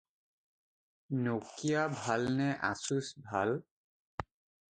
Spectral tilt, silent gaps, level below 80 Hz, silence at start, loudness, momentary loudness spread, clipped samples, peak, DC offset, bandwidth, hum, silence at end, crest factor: -5.5 dB/octave; 3.71-4.18 s; -66 dBFS; 1.1 s; -35 LUFS; 13 LU; under 0.1%; -16 dBFS; under 0.1%; 9.4 kHz; none; 0.55 s; 20 dB